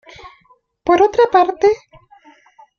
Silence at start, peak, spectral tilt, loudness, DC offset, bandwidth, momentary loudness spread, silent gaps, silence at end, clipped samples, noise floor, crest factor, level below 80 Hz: 0.25 s; -2 dBFS; -5 dB/octave; -15 LUFS; under 0.1%; 7 kHz; 11 LU; none; 1 s; under 0.1%; -55 dBFS; 16 dB; -52 dBFS